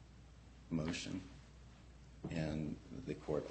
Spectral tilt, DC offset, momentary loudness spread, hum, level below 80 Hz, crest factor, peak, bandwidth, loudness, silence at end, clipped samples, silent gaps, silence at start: -6 dB/octave; under 0.1%; 20 LU; none; -58 dBFS; 20 dB; -26 dBFS; 8.4 kHz; -44 LUFS; 0 s; under 0.1%; none; 0 s